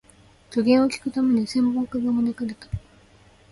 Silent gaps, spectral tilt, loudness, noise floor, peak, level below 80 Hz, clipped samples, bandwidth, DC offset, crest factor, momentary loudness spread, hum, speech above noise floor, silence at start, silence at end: none; -6 dB/octave; -23 LUFS; -54 dBFS; -6 dBFS; -50 dBFS; under 0.1%; 11.5 kHz; under 0.1%; 16 dB; 14 LU; none; 32 dB; 0.5 s; 0.75 s